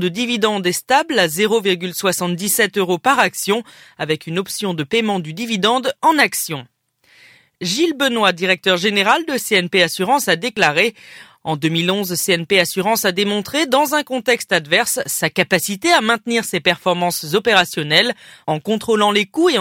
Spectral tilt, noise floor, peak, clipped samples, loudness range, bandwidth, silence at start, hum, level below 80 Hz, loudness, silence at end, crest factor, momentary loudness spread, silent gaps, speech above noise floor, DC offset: -3 dB/octave; -53 dBFS; 0 dBFS; under 0.1%; 3 LU; 17 kHz; 0 s; none; -62 dBFS; -17 LUFS; 0 s; 18 dB; 7 LU; none; 36 dB; under 0.1%